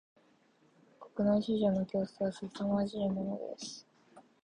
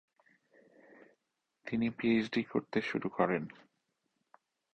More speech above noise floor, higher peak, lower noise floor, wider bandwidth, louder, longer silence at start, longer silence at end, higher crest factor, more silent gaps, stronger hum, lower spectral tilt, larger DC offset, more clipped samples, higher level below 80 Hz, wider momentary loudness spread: second, 35 dB vs 51 dB; second, -18 dBFS vs -14 dBFS; second, -68 dBFS vs -84 dBFS; first, 9.8 kHz vs 6.6 kHz; about the same, -34 LUFS vs -34 LUFS; second, 1 s vs 1.65 s; second, 0.25 s vs 1.25 s; second, 16 dB vs 24 dB; neither; neither; about the same, -7 dB/octave vs -7 dB/octave; neither; neither; about the same, -66 dBFS vs -70 dBFS; first, 14 LU vs 8 LU